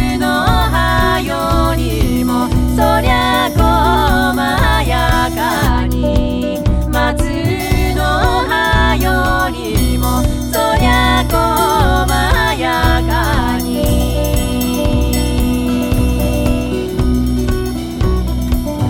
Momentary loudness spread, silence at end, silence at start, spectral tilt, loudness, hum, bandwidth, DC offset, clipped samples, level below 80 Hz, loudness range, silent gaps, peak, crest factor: 4 LU; 0 s; 0 s; -5.5 dB/octave; -14 LUFS; none; 17 kHz; under 0.1%; under 0.1%; -18 dBFS; 3 LU; none; 0 dBFS; 12 dB